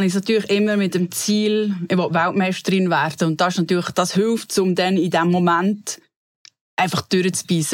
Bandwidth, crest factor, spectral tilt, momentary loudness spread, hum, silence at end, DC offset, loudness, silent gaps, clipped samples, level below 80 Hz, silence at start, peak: 16.5 kHz; 12 dB; -5 dB/octave; 3 LU; none; 0 s; under 0.1%; -19 LUFS; 6.16-6.45 s, 6.61-6.77 s; under 0.1%; -66 dBFS; 0 s; -6 dBFS